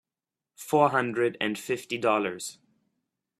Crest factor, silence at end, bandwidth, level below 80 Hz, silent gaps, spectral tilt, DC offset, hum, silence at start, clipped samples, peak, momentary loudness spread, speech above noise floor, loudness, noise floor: 22 dB; 0.85 s; 14.5 kHz; -72 dBFS; none; -4.5 dB/octave; under 0.1%; none; 0.6 s; under 0.1%; -8 dBFS; 14 LU; 63 dB; -27 LUFS; -90 dBFS